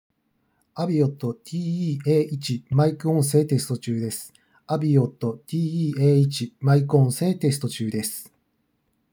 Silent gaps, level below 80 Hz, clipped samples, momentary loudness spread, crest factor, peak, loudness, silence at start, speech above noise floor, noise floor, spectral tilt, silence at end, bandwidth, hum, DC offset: none; -68 dBFS; under 0.1%; 11 LU; 18 dB; -6 dBFS; -23 LUFS; 0.75 s; 49 dB; -71 dBFS; -7 dB/octave; 0.9 s; over 20 kHz; none; under 0.1%